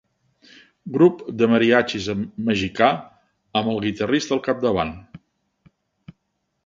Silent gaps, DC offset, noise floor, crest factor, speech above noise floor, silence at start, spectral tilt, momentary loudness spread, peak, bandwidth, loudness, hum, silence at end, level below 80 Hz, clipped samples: none; under 0.1%; -74 dBFS; 22 dB; 54 dB; 0.85 s; -5.5 dB/octave; 11 LU; 0 dBFS; 7.6 kHz; -21 LUFS; none; 1.5 s; -52 dBFS; under 0.1%